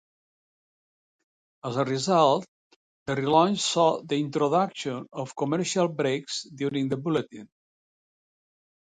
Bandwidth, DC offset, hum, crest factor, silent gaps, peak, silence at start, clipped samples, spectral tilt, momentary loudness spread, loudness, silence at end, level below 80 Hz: 9.6 kHz; under 0.1%; none; 22 dB; 2.48-3.06 s; -6 dBFS; 1.65 s; under 0.1%; -5 dB/octave; 12 LU; -26 LUFS; 1.35 s; -70 dBFS